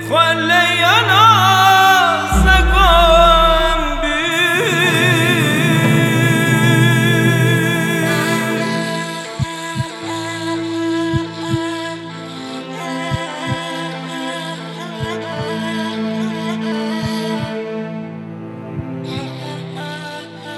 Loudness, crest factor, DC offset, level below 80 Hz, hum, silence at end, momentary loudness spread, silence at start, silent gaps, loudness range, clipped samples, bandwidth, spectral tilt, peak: -15 LUFS; 16 dB; under 0.1%; -26 dBFS; none; 0 s; 17 LU; 0 s; none; 13 LU; under 0.1%; 17.5 kHz; -4.5 dB/octave; 0 dBFS